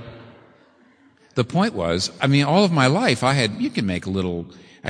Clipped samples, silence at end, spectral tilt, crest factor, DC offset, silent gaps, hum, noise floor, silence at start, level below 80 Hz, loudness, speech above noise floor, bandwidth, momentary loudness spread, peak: under 0.1%; 0 s; -5.5 dB/octave; 20 dB; under 0.1%; none; none; -55 dBFS; 0 s; -54 dBFS; -20 LUFS; 35 dB; 10.5 kHz; 11 LU; -2 dBFS